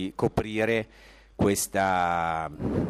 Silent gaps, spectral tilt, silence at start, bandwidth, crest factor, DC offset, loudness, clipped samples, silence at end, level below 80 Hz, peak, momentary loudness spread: none; -5 dB/octave; 0 s; 15.5 kHz; 16 dB; under 0.1%; -27 LUFS; under 0.1%; 0 s; -46 dBFS; -10 dBFS; 6 LU